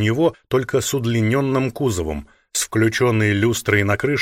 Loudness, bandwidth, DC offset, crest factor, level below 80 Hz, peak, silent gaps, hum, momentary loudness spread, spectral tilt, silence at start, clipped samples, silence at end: -19 LUFS; 16.5 kHz; under 0.1%; 16 dB; -44 dBFS; -4 dBFS; none; none; 6 LU; -5 dB/octave; 0 s; under 0.1%; 0 s